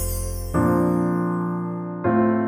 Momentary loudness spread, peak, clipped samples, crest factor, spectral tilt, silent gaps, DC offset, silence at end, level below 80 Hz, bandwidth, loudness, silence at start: 8 LU; -8 dBFS; under 0.1%; 14 dB; -7 dB/octave; none; under 0.1%; 0 s; -36 dBFS; 18 kHz; -23 LUFS; 0 s